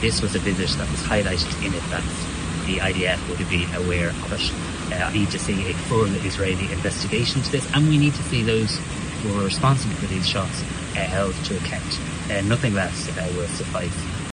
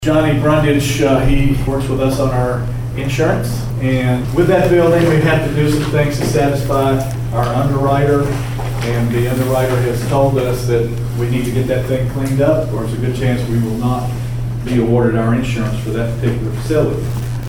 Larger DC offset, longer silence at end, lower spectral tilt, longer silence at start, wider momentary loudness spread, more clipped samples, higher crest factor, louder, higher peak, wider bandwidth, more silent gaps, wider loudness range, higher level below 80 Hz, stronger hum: neither; about the same, 0 s vs 0 s; second, -4.5 dB/octave vs -7 dB/octave; about the same, 0 s vs 0 s; about the same, 6 LU vs 7 LU; neither; first, 18 dB vs 12 dB; second, -23 LUFS vs -16 LUFS; about the same, -4 dBFS vs -2 dBFS; second, 10 kHz vs 17 kHz; neither; about the same, 3 LU vs 3 LU; second, -36 dBFS vs -28 dBFS; neither